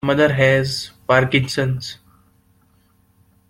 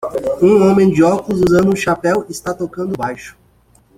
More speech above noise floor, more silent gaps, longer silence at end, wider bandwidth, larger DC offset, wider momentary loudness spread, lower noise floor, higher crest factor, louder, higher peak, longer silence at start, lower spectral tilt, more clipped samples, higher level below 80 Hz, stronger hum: about the same, 41 dB vs 38 dB; neither; first, 1.55 s vs 0.65 s; about the same, 15.5 kHz vs 15.5 kHz; neither; about the same, 12 LU vs 12 LU; first, -58 dBFS vs -52 dBFS; about the same, 18 dB vs 14 dB; second, -18 LUFS vs -14 LUFS; about the same, -2 dBFS vs -2 dBFS; about the same, 0.05 s vs 0 s; about the same, -5.5 dB/octave vs -6.5 dB/octave; neither; about the same, -50 dBFS vs -46 dBFS; neither